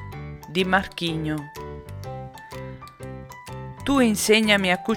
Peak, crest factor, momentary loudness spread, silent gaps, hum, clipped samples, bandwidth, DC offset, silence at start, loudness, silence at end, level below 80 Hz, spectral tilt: -4 dBFS; 22 dB; 20 LU; none; none; under 0.1%; 18.5 kHz; under 0.1%; 0 s; -21 LUFS; 0 s; -48 dBFS; -4 dB/octave